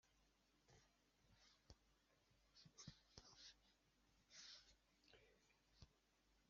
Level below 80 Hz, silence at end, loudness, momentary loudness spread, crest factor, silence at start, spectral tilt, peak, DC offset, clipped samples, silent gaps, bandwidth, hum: -82 dBFS; 0 s; -65 LUFS; 6 LU; 32 dB; 0.05 s; -2.5 dB/octave; -40 dBFS; under 0.1%; under 0.1%; none; 7.2 kHz; none